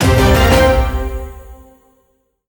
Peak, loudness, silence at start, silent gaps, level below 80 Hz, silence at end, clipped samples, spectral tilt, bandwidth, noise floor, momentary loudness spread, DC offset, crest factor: 0 dBFS; -13 LUFS; 0 s; none; -20 dBFS; 0.95 s; under 0.1%; -5.5 dB/octave; over 20 kHz; -61 dBFS; 18 LU; under 0.1%; 14 dB